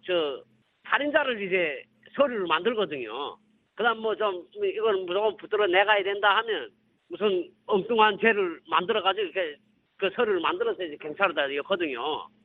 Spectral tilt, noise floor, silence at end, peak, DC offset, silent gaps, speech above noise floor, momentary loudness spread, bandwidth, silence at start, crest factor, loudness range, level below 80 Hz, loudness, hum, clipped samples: -7.5 dB/octave; -53 dBFS; 0.2 s; -6 dBFS; under 0.1%; none; 27 dB; 11 LU; 4.3 kHz; 0.05 s; 20 dB; 3 LU; -72 dBFS; -26 LUFS; none; under 0.1%